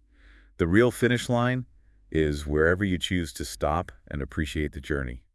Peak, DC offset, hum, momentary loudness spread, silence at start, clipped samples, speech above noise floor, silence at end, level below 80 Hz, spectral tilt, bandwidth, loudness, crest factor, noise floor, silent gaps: -8 dBFS; under 0.1%; none; 11 LU; 0.6 s; under 0.1%; 29 dB; 0.15 s; -42 dBFS; -6 dB/octave; 12 kHz; -27 LUFS; 20 dB; -55 dBFS; none